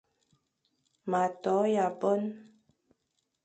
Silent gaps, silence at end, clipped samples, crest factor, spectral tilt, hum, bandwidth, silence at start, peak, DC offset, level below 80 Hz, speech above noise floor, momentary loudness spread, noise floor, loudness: none; 1 s; under 0.1%; 18 dB; -6.5 dB/octave; none; 9 kHz; 1.05 s; -14 dBFS; under 0.1%; -82 dBFS; 51 dB; 14 LU; -80 dBFS; -30 LUFS